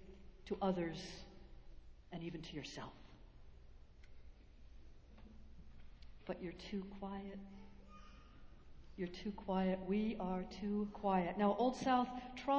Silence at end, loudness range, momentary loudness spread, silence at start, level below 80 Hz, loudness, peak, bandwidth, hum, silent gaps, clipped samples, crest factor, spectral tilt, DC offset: 0 s; 17 LU; 26 LU; 0 s; -60 dBFS; -41 LUFS; -22 dBFS; 8 kHz; none; none; under 0.1%; 20 dB; -6.5 dB/octave; under 0.1%